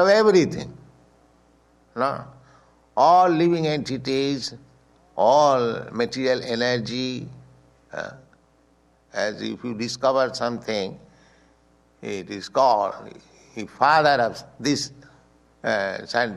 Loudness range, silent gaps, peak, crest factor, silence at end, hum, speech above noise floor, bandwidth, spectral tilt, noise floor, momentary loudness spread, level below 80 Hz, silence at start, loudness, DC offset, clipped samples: 7 LU; none; -4 dBFS; 20 dB; 0 s; none; 38 dB; 12 kHz; -5 dB/octave; -60 dBFS; 18 LU; -62 dBFS; 0 s; -22 LUFS; under 0.1%; under 0.1%